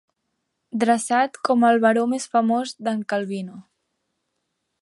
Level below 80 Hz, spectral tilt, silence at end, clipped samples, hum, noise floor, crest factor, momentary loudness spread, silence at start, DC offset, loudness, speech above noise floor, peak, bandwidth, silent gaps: -76 dBFS; -4.5 dB/octave; 1.2 s; under 0.1%; none; -77 dBFS; 18 dB; 13 LU; 0.75 s; under 0.1%; -21 LUFS; 56 dB; -6 dBFS; 11.5 kHz; none